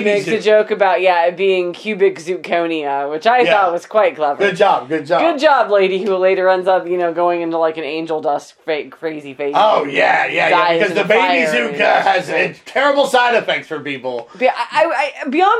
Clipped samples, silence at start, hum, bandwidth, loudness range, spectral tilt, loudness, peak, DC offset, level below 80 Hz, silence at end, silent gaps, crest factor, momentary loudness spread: under 0.1%; 0 s; none; 13 kHz; 3 LU; -4.5 dB/octave; -15 LUFS; 0 dBFS; under 0.1%; -70 dBFS; 0 s; none; 14 dB; 9 LU